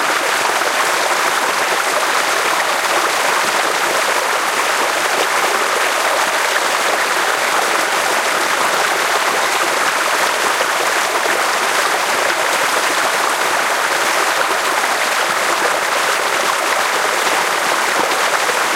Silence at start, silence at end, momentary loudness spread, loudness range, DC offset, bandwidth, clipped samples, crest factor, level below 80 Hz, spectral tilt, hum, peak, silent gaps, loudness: 0 s; 0 s; 1 LU; 0 LU; under 0.1%; 16 kHz; under 0.1%; 16 dB; -64 dBFS; 0 dB/octave; none; 0 dBFS; none; -15 LUFS